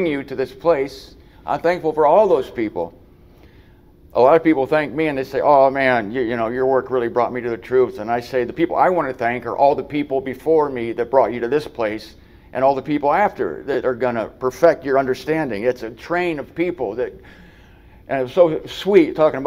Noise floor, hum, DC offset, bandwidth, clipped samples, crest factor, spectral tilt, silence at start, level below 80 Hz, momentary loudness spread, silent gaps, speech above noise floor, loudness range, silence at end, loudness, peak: -48 dBFS; none; under 0.1%; 15.5 kHz; under 0.1%; 18 dB; -6.5 dB/octave; 0 s; -50 dBFS; 10 LU; none; 29 dB; 3 LU; 0 s; -19 LUFS; 0 dBFS